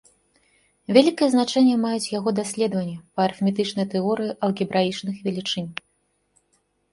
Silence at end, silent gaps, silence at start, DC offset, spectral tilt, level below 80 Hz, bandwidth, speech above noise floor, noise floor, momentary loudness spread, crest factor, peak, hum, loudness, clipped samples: 1.2 s; none; 0.9 s; under 0.1%; -5.5 dB/octave; -66 dBFS; 11.5 kHz; 48 dB; -69 dBFS; 10 LU; 22 dB; -2 dBFS; none; -22 LUFS; under 0.1%